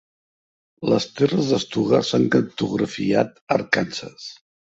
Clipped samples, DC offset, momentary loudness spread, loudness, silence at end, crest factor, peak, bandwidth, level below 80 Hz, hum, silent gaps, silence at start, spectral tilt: under 0.1%; under 0.1%; 11 LU; -21 LUFS; 0.45 s; 20 dB; -2 dBFS; 8 kHz; -58 dBFS; none; 3.41-3.47 s; 0.8 s; -5.5 dB/octave